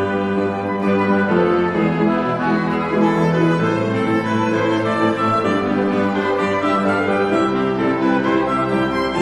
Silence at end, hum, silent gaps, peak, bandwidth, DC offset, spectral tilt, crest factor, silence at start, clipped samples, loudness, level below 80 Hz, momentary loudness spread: 0 s; none; none; -4 dBFS; 11 kHz; 0.1%; -7 dB/octave; 14 dB; 0 s; under 0.1%; -18 LUFS; -50 dBFS; 3 LU